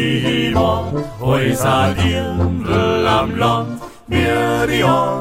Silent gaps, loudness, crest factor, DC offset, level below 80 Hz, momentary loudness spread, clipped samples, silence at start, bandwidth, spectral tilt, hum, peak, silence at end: none; -16 LUFS; 14 dB; under 0.1%; -34 dBFS; 6 LU; under 0.1%; 0 s; 16 kHz; -6 dB/octave; none; -2 dBFS; 0 s